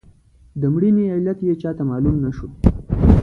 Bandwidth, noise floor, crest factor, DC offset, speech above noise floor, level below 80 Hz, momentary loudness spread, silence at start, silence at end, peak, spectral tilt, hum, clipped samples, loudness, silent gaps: 5.8 kHz; -49 dBFS; 18 dB; under 0.1%; 31 dB; -26 dBFS; 7 LU; 0.55 s; 0 s; 0 dBFS; -11 dB/octave; none; under 0.1%; -19 LUFS; none